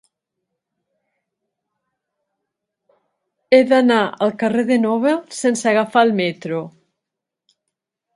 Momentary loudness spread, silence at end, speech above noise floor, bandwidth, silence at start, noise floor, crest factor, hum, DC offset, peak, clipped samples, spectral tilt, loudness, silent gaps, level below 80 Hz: 11 LU; 1.45 s; 67 dB; 11.5 kHz; 3.5 s; -83 dBFS; 20 dB; none; under 0.1%; 0 dBFS; under 0.1%; -5 dB/octave; -17 LUFS; none; -72 dBFS